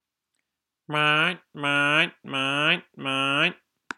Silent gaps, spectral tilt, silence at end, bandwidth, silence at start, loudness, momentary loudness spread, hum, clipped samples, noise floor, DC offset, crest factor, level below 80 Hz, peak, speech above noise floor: none; -4 dB/octave; 0.45 s; 12.5 kHz; 0.9 s; -23 LUFS; 7 LU; none; under 0.1%; -82 dBFS; under 0.1%; 20 dB; -80 dBFS; -6 dBFS; 58 dB